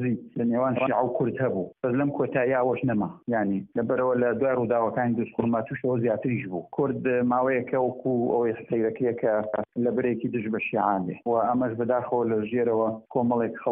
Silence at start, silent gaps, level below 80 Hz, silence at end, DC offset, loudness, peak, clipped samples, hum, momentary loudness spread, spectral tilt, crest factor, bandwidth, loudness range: 0 s; none; -64 dBFS; 0 s; under 0.1%; -26 LUFS; -10 dBFS; under 0.1%; none; 4 LU; -4 dB/octave; 16 dB; 3.6 kHz; 1 LU